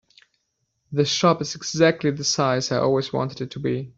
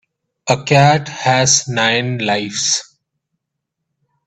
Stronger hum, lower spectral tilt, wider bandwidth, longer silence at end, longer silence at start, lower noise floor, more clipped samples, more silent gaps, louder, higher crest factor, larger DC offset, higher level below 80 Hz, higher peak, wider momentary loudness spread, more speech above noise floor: neither; first, -4.5 dB/octave vs -3 dB/octave; second, 8 kHz vs 9 kHz; second, 0.1 s vs 1.45 s; first, 0.9 s vs 0.45 s; about the same, -74 dBFS vs -77 dBFS; neither; neither; second, -22 LUFS vs -14 LUFS; about the same, 20 dB vs 18 dB; neither; second, -60 dBFS vs -54 dBFS; second, -4 dBFS vs 0 dBFS; about the same, 8 LU vs 8 LU; second, 52 dB vs 63 dB